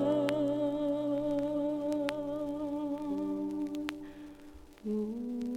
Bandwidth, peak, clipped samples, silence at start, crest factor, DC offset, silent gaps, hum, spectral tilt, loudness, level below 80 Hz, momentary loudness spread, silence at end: 13 kHz; -12 dBFS; under 0.1%; 0 s; 20 dB; under 0.1%; none; none; -7 dB/octave; -34 LUFS; -62 dBFS; 14 LU; 0 s